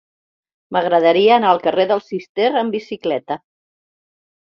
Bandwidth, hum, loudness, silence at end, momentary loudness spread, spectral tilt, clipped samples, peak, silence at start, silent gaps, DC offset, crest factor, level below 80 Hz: 6.8 kHz; none; -17 LUFS; 1.05 s; 11 LU; -6.5 dB/octave; under 0.1%; -2 dBFS; 0.7 s; 2.29-2.35 s; under 0.1%; 16 dB; -66 dBFS